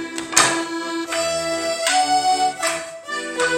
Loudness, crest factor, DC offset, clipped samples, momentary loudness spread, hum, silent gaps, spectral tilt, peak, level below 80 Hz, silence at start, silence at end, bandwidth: -20 LUFS; 20 dB; under 0.1%; under 0.1%; 10 LU; none; none; -1 dB/octave; 0 dBFS; -58 dBFS; 0 s; 0 s; 16.5 kHz